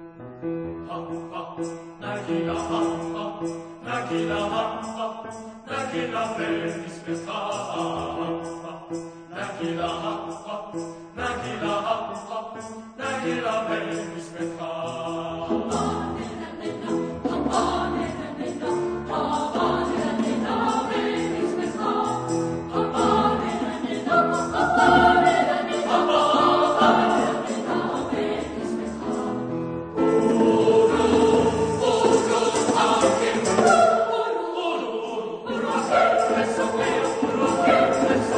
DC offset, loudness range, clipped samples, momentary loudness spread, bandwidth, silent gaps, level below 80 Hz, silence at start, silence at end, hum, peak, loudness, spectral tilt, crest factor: under 0.1%; 10 LU; under 0.1%; 15 LU; 9.8 kHz; none; -50 dBFS; 0 s; 0 s; none; -2 dBFS; -23 LUFS; -5 dB/octave; 20 dB